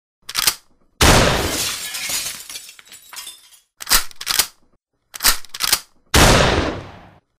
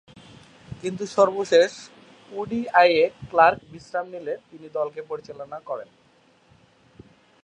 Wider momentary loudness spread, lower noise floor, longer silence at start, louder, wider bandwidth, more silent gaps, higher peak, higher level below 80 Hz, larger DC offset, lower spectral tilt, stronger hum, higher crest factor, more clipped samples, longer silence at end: first, 21 LU vs 17 LU; about the same, -62 dBFS vs -59 dBFS; second, 0.3 s vs 0.7 s; first, -17 LUFS vs -22 LUFS; first, 16 kHz vs 9.8 kHz; neither; about the same, 0 dBFS vs -2 dBFS; first, -30 dBFS vs -62 dBFS; neither; second, -2.5 dB/octave vs -4.5 dB/octave; neither; about the same, 20 dB vs 22 dB; neither; second, 0.4 s vs 1.6 s